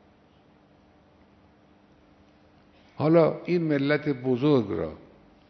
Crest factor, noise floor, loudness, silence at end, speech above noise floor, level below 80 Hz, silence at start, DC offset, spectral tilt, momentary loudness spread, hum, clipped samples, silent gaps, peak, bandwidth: 20 dB; -58 dBFS; -25 LUFS; 0.55 s; 35 dB; -62 dBFS; 3 s; under 0.1%; -9.5 dB/octave; 10 LU; none; under 0.1%; none; -8 dBFS; 6.2 kHz